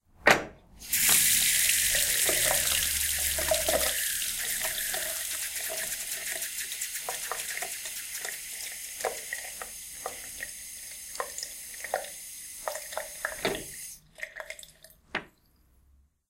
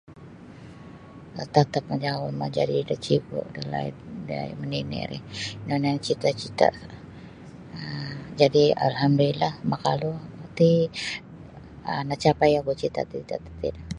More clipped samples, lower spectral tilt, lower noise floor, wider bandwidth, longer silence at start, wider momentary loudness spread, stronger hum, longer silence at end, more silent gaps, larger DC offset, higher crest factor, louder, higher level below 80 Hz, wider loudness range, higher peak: neither; second, 0 dB/octave vs -6.5 dB/octave; first, -64 dBFS vs -44 dBFS; first, 17 kHz vs 11 kHz; about the same, 0.2 s vs 0.1 s; second, 17 LU vs 23 LU; neither; first, 1 s vs 0 s; neither; neither; about the same, 28 dB vs 24 dB; second, -28 LUFS vs -25 LUFS; about the same, -54 dBFS vs -52 dBFS; first, 14 LU vs 6 LU; about the same, -4 dBFS vs -2 dBFS